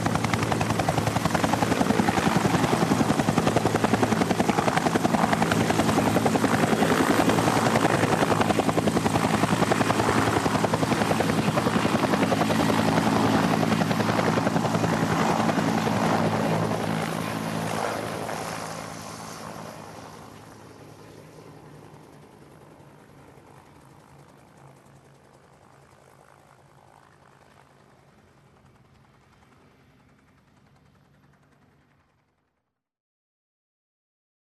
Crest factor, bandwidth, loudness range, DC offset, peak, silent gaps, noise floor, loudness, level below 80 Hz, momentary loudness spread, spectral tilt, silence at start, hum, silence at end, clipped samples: 20 dB; 14 kHz; 13 LU; under 0.1%; -6 dBFS; none; -80 dBFS; -23 LUFS; -52 dBFS; 10 LU; -5.5 dB/octave; 0 s; none; 12.5 s; under 0.1%